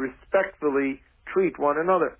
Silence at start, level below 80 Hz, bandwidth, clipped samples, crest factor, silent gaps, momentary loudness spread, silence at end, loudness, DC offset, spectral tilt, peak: 0 s; -58 dBFS; 3.7 kHz; under 0.1%; 14 dB; none; 7 LU; 0.05 s; -25 LUFS; under 0.1%; -10 dB/octave; -10 dBFS